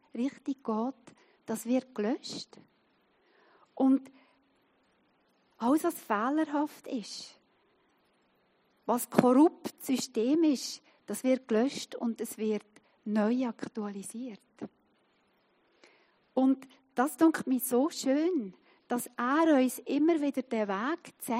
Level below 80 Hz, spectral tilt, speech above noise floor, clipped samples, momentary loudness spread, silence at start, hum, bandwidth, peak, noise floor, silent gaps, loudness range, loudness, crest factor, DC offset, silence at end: -86 dBFS; -4.5 dB/octave; 41 dB; under 0.1%; 15 LU; 0.15 s; none; 15.5 kHz; -4 dBFS; -71 dBFS; none; 7 LU; -30 LUFS; 26 dB; under 0.1%; 0 s